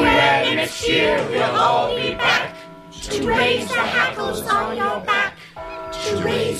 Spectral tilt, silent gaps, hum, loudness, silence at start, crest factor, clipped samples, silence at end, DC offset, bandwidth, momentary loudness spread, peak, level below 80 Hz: -3.5 dB/octave; none; none; -19 LUFS; 0 s; 16 dB; under 0.1%; 0 s; under 0.1%; 15 kHz; 13 LU; -4 dBFS; -44 dBFS